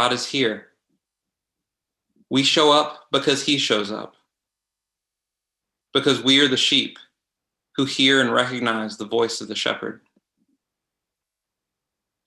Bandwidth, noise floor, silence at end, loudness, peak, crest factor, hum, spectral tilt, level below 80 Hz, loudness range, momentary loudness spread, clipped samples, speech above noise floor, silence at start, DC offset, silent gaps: 12 kHz; -86 dBFS; 2.3 s; -19 LUFS; -2 dBFS; 22 dB; none; -3 dB/octave; -70 dBFS; 6 LU; 13 LU; under 0.1%; 66 dB; 0 s; under 0.1%; none